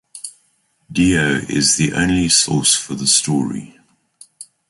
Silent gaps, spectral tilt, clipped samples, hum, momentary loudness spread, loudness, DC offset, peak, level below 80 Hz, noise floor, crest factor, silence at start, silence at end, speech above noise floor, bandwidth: none; -3 dB/octave; under 0.1%; none; 16 LU; -15 LUFS; under 0.1%; 0 dBFS; -42 dBFS; -62 dBFS; 18 dB; 0.15 s; 0.25 s; 46 dB; 11.5 kHz